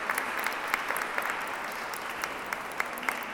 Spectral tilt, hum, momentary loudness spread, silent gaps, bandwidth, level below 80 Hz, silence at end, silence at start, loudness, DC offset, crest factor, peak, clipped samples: -1.5 dB/octave; none; 5 LU; none; over 20 kHz; -66 dBFS; 0 s; 0 s; -32 LUFS; under 0.1%; 26 dB; -8 dBFS; under 0.1%